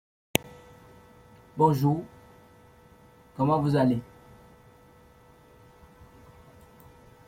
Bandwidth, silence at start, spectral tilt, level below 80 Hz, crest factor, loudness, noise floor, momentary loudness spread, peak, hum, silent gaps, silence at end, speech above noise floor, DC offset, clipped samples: 16.5 kHz; 0.45 s; -6.5 dB/octave; -60 dBFS; 30 dB; -26 LUFS; -55 dBFS; 26 LU; 0 dBFS; none; none; 3.25 s; 32 dB; under 0.1%; under 0.1%